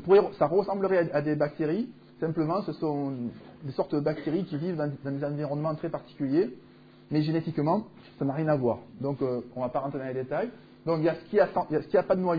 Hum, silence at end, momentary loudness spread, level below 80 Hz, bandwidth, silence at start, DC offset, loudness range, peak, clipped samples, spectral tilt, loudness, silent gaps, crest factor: none; 0 s; 8 LU; -64 dBFS; 5 kHz; 0 s; under 0.1%; 3 LU; -10 dBFS; under 0.1%; -10 dB/octave; -29 LUFS; none; 18 dB